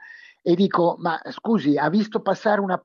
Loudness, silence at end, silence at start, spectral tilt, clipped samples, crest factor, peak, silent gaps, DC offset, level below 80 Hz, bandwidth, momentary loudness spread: -22 LUFS; 0.05 s; 0 s; -7.5 dB/octave; under 0.1%; 14 dB; -8 dBFS; none; under 0.1%; -78 dBFS; 7.2 kHz; 7 LU